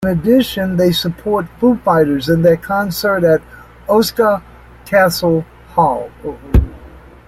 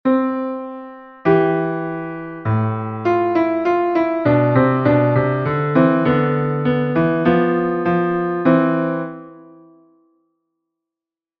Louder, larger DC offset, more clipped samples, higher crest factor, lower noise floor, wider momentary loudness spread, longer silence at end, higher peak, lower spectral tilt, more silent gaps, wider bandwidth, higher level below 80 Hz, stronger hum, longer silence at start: first, -15 LUFS vs -18 LUFS; neither; neither; about the same, 14 dB vs 16 dB; second, -38 dBFS vs -89 dBFS; second, 8 LU vs 11 LU; second, 0.3 s vs 2 s; about the same, -2 dBFS vs -2 dBFS; second, -6 dB/octave vs -10 dB/octave; neither; first, 16.5 kHz vs 5.8 kHz; first, -28 dBFS vs -52 dBFS; neither; about the same, 0 s vs 0.05 s